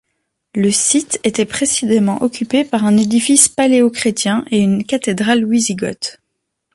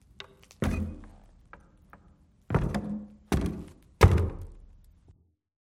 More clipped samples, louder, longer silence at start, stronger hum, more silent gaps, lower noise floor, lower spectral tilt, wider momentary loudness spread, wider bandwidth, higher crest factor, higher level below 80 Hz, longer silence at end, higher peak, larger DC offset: neither; first, -14 LUFS vs -29 LUFS; first, 0.55 s vs 0.2 s; neither; neither; first, -74 dBFS vs -61 dBFS; second, -3.5 dB/octave vs -7 dB/octave; second, 8 LU vs 25 LU; second, 12 kHz vs 15.5 kHz; second, 16 dB vs 24 dB; second, -54 dBFS vs -36 dBFS; second, 0.65 s vs 1.15 s; first, 0 dBFS vs -6 dBFS; neither